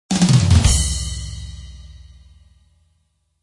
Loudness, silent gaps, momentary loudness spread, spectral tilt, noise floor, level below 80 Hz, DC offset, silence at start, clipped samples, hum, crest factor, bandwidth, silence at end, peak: -16 LUFS; none; 23 LU; -4.5 dB/octave; -66 dBFS; -28 dBFS; under 0.1%; 0.1 s; under 0.1%; none; 18 dB; 11.5 kHz; 1.45 s; -2 dBFS